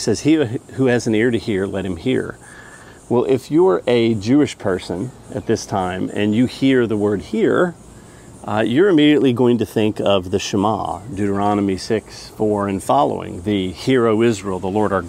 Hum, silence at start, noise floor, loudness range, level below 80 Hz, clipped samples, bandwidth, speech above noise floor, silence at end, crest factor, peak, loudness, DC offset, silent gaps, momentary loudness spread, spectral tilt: none; 0 s; -41 dBFS; 3 LU; -48 dBFS; under 0.1%; 15 kHz; 23 dB; 0 s; 16 dB; -2 dBFS; -18 LUFS; under 0.1%; none; 8 LU; -6 dB/octave